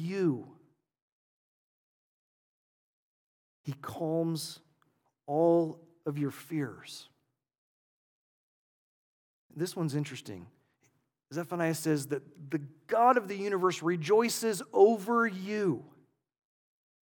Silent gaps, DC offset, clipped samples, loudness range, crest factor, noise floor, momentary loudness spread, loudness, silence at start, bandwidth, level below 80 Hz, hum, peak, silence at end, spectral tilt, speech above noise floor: 1.02-3.64 s, 7.58-9.50 s; under 0.1%; under 0.1%; 14 LU; 22 dB; -74 dBFS; 18 LU; -31 LUFS; 0 s; 19 kHz; -84 dBFS; none; -10 dBFS; 1.15 s; -5.5 dB/octave; 44 dB